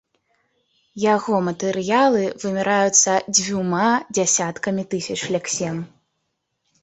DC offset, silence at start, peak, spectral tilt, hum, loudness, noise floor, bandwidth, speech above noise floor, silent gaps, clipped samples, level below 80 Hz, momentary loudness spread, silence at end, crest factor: under 0.1%; 0.95 s; 0 dBFS; -3 dB/octave; none; -20 LUFS; -75 dBFS; 8.4 kHz; 55 dB; none; under 0.1%; -62 dBFS; 10 LU; 0.95 s; 20 dB